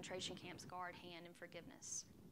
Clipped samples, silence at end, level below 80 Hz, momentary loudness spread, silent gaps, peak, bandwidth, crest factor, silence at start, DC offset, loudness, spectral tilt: under 0.1%; 0 s; -80 dBFS; 8 LU; none; -34 dBFS; 16 kHz; 18 dB; 0 s; under 0.1%; -51 LUFS; -2.5 dB/octave